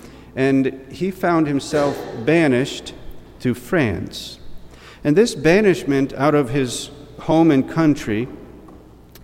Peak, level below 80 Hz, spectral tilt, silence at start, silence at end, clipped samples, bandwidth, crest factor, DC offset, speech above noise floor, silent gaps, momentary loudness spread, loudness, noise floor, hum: -2 dBFS; -44 dBFS; -6 dB/octave; 0.05 s; 0.45 s; under 0.1%; 16.5 kHz; 18 dB; under 0.1%; 25 dB; none; 16 LU; -19 LUFS; -43 dBFS; none